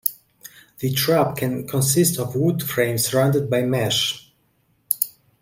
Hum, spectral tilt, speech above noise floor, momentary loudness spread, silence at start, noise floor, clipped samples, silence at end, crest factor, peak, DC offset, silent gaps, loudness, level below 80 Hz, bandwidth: none; -4.5 dB/octave; 44 dB; 7 LU; 0.05 s; -64 dBFS; under 0.1%; 0.3 s; 20 dB; -2 dBFS; under 0.1%; none; -21 LUFS; -58 dBFS; 16.5 kHz